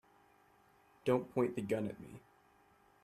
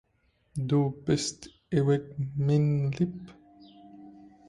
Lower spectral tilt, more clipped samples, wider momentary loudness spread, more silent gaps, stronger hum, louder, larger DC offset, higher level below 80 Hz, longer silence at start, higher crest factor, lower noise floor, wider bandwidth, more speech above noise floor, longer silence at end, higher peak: about the same, -7.5 dB/octave vs -6.5 dB/octave; neither; first, 19 LU vs 11 LU; neither; neither; second, -37 LUFS vs -28 LUFS; neither; second, -76 dBFS vs -60 dBFS; first, 1.05 s vs 0.55 s; first, 22 dB vs 16 dB; about the same, -68 dBFS vs -70 dBFS; first, 14 kHz vs 11.5 kHz; second, 32 dB vs 43 dB; first, 0.85 s vs 0.2 s; second, -18 dBFS vs -12 dBFS